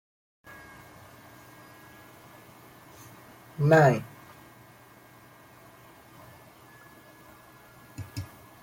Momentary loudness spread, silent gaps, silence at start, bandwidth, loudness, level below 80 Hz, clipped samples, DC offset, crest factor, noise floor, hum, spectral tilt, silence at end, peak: 29 LU; none; 3.6 s; 16.5 kHz; -24 LUFS; -66 dBFS; under 0.1%; under 0.1%; 24 dB; -54 dBFS; none; -7 dB/octave; 0.4 s; -8 dBFS